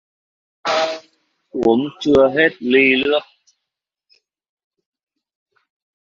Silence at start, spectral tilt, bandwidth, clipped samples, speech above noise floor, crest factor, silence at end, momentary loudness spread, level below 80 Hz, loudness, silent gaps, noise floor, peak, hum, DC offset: 0.65 s; -5 dB/octave; 7.4 kHz; under 0.1%; 67 dB; 18 dB; 2.8 s; 12 LU; -54 dBFS; -16 LUFS; none; -82 dBFS; -2 dBFS; none; under 0.1%